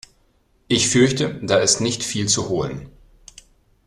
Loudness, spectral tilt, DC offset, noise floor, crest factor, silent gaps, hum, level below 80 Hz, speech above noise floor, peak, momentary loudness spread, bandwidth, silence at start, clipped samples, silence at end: -19 LUFS; -3.5 dB/octave; under 0.1%; -60 dBFS; 18 dB; none; none; -50 dBFS; 41 dB; -4 dBFS; 9 LU; 13 kHz; 0.7 s; under 0.1%; 1 s